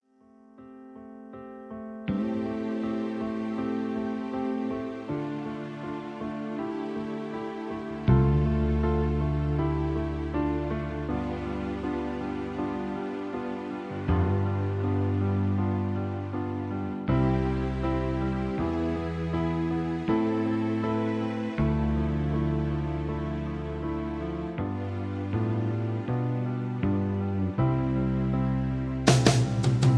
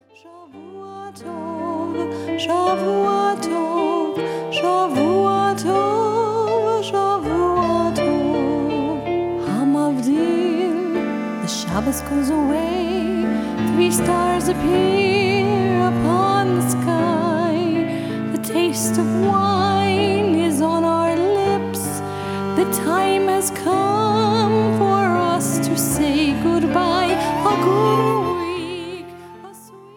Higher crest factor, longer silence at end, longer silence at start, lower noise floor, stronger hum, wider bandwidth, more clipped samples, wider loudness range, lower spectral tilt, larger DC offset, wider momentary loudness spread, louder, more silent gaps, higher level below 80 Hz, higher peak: first, 24 dB vs 14 dB; about the same, 0 s vs 0.05 s; first, 0.55 s vs 0.25 s; first, -57 dBFS vs -41 dBFS; neither; second, 11 kHz vs 17.5 kHz; neither; first, 6 LU vs 3 LU; first, -7 dB/octave vs -5 dB/octave; neither; about the same, 9 LU vs 7 LU; second, -29 LUFS vs -19 LUFS; neither; first, -38 dBFS vs -46 dBFS; about the same, -4 dBFS vs -4 dBFS